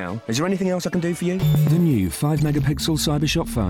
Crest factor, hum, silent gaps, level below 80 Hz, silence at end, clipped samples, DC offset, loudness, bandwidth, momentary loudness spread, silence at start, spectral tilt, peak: 10 dB; none; none; -38 dBFS; 0 s; under 0.1%; under 0.1%; -21 LUFS; over 20 kHz; 5 LU; 0 s; -6 dB/octave; -10 dBFS